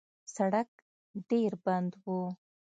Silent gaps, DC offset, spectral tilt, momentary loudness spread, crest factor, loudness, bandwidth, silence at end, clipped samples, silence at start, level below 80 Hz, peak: 0.68-1.14 s; under 0.1%; -7 dB/octave; 16 LU; 18 dB; -33 LUFS; 9.2 kHz; 0.45 s; under 0.1%; 0.3 s; -82 dBFS; -16 dBFS